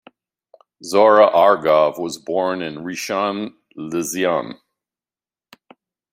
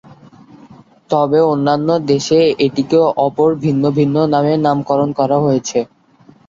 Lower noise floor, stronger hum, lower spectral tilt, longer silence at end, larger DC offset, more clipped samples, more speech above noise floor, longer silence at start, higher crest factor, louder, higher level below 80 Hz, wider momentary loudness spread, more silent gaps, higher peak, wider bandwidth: first, under -90 dBFS vs -47 dBFS; neither; second, -4 dB/octave vs -6.5 dB/octave; first, 1.6 s vs 0.65 s; neither; neither; first, over 73 dB vs 33 dB; second, 0.8 s vs 1.1 s; about the same, 18 dB vs 14 dB; second, -18 LUFS vs -14 LUFS; second, -66 dBFS vs -54 dBFS; first, 17 LU vs 4 LU; neither; about the same, -2 dBFS vs -2 dBFS; first, 16 kHz vs 7.6 kHz